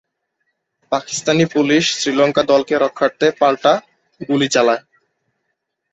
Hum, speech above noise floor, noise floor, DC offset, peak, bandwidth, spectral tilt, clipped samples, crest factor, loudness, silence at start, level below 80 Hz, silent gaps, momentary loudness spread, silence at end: none; 58 dB; -74 dBFS; under 0.1%; -2 dBFS; 8.2 kHz; -4 dB/octave; under 0.1%; 16 dB; -16 LUFS; 0.9 s; -60 dBFS; none; 7 LU; 1.15 s